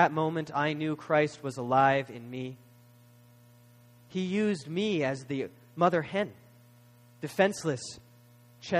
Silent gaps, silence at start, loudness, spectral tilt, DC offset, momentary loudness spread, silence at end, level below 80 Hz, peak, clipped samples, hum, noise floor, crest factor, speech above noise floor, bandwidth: none; 0 s; -30 LUFS; -5.5 dB/octave; under 0.1%; 14 LU; 0 s; -72 dBFS; -8 dBFS; under 0.1%; 60 Hz at -60 dBFS; -57 dBFS; 22 dB; 28 dB; 15.5 kHz